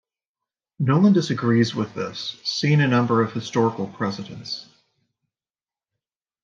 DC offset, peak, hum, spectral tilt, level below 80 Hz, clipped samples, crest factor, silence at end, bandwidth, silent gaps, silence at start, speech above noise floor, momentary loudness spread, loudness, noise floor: under 0.1%; -6 dBFS; none; -6.5 dB/octave; -68 dBFS; under 0.1%; 16 dB; 1.8 s; 7.6 kHz; none; 0.8 s; over 69 dB; 13 LU; -22 LUFS; under -90 dBFS